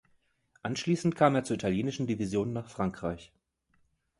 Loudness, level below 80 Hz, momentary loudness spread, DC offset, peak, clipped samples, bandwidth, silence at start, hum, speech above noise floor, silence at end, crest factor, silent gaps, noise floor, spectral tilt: -31 LUFS; -58 dBFS; 12 LU; under 0.1%; -8 dBFS; under 0.1%; 11.5 kHz; 0.65 s; none; 42 dB; 0.95 s; 24 dB; none; -72 dBFS; -6 dB/octave